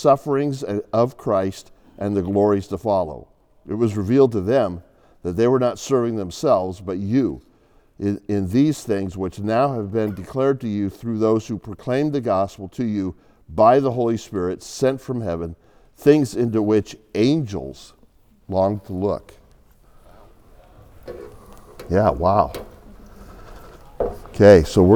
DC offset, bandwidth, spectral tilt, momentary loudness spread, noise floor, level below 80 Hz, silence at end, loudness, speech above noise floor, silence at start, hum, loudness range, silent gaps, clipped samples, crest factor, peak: under 0.1%; 17.5 kHz; -7 dB/octave; 13 LU; -55 dBFS; -46 dBFS; 0 s; -21 LUFS; 35 dB; 0 s; none; 5 LU; none; under 0.1%; 20 dB; 0 dBFS